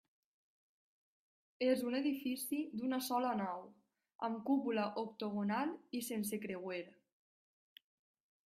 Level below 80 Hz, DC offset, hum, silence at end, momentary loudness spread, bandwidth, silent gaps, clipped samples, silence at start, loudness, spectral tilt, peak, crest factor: -84 dBFS; under 0.1%; none; 1.55 s; 8 LU; 15.5 kHz; 4.15-4.19 s; under 0.1%; 1.6 s; -39 LUFS; -4.5 dB/octave; -22 dBFS; 18 dB